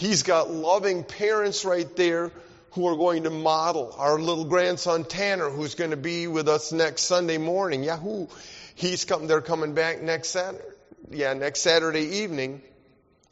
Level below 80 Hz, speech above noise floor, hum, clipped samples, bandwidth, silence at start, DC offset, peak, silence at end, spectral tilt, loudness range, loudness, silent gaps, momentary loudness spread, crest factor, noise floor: -64 dBFS; 36 dB; none; under 0.1%; 8 kHz; 0 s; under 0.1%; -8 dBFS; 0.7 s; -3 dB/octave; 2 LU; -25 LUFS; none; 9 LU; 18 dB; -61 dBFS